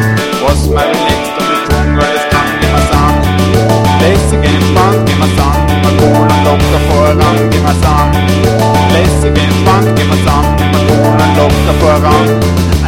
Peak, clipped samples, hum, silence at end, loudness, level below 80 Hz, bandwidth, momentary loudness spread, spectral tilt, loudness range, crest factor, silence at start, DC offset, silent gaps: 0 dBFS; 0.4%; none; 0 s; -9 LUFS; -18 dBFS; 17 kHz; 3 LU; -6 dB/octave; 1 LU; 8 dB; 0 s; 0.3%; none